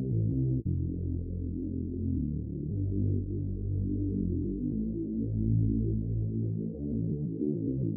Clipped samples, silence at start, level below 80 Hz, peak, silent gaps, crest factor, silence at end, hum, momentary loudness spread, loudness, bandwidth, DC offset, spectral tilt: under 0.1%; 0 s; -40 dBFS; -18 dBFS; none; 14 dB; 0 s; none; 6 LU; -32 LUFS; 0.8 kHz; under 0.1%; -18.5 dB/octave